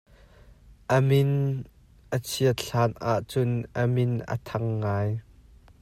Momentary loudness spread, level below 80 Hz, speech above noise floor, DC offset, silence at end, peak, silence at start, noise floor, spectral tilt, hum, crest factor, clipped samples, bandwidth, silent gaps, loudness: 10 LU; -54 dBFS; 28 dB; under 0.1%; 0.6 s; -10 dBFS; 0.7 s; -53 dBFS; -6.5 dB/octave; none; 16 dB; under 0.1%; 16 kHz; none; -26 LUFS